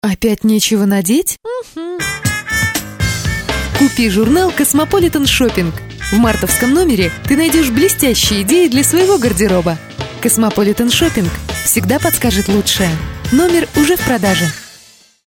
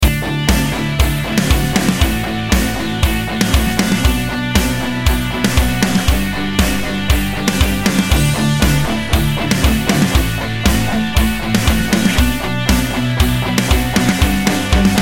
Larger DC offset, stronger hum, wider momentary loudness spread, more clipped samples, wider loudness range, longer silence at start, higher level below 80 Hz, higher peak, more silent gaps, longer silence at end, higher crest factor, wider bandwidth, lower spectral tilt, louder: neither; neither; first, 8 LU vs 3 LU; neither; first, 4 LU vs 1 LU; about the same, 0.05 s vs 0 s; second, -30 dBFS vs -20 dBFS; about the same, 0 dBFS vs 0 dBFS; neither; first, 0.55 s vs 0 s; about the same, 14 dB vs 14 dB; first, 20 kHz vs 17 kHz; about the same, -4 dB/octave vs -4.5 dB/octave; about the same, -13 LUFS vs -15 LUFS